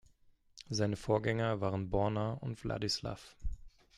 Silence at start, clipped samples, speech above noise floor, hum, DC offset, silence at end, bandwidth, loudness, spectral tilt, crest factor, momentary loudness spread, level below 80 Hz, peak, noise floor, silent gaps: 0.55 s; under 0.1%; 32 dB; none; under 0.1%; 0.3 s; 12.5 kHz; -36 LUFS; -5.5 dB/octave; 18 dB; 15 LU; -50 dBFS; -18 dBFS; -67 dBFS; none